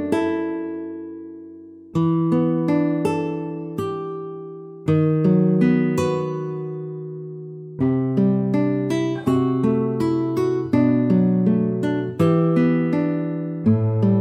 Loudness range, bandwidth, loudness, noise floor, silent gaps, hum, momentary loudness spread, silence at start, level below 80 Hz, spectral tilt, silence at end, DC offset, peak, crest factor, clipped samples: 4 LU; 12 kHz; -21 LUFS; -41 dBFS; none; none; 15 LU; 0 s; -60 dBFS; -9 dB/octave; 0 s; under 0.1%; -6 dBFS; 14 dB; under 0.1%